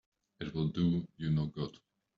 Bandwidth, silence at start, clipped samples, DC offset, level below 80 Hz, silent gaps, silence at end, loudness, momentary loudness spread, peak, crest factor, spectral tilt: 6.6 kHz; 0.4 s; under 0.1%; under 0.1%; -60 dBFS; none; 0.45 s; -35 LUFS; 10 LU; -20 dBFS; 16 dB; -8 dB/octave